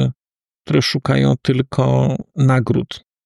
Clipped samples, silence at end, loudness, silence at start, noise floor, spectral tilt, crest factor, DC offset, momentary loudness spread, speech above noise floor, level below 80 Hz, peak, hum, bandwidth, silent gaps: under 0.1%; 0.3 s; -17 LUFS; 0 s; under -90 dBFS; -7 dB/octave; 14 dB; under 0.1%; 5 LU; over 74 dB; -46 dBFS; -4 dBFS; none; 11.5 kHz; 0.55-0.59 s